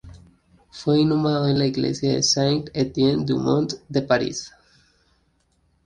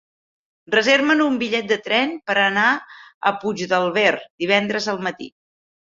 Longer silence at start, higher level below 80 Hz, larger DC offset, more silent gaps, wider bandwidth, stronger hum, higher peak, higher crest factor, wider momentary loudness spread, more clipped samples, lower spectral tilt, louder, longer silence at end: second, 0.05 s vs 0.7 s; first, -52 dBFS vs -66 dBFS; neither; second, none vs 3.14-3.21 s, 4.30-4.38 s; first, 10 kHz vs 7.8 kHz; neither; about the same, -4 dBFS vs -2 dBFS; about the same, 18 dB vs 20 dB; about the same, 8 LU vs 10 LU; neither; about the same, -5 dB/octave vs -4 dB/octave; about the same, -21 LUFS vs -19 LUFS; first, 1.35 s vs 0.65 s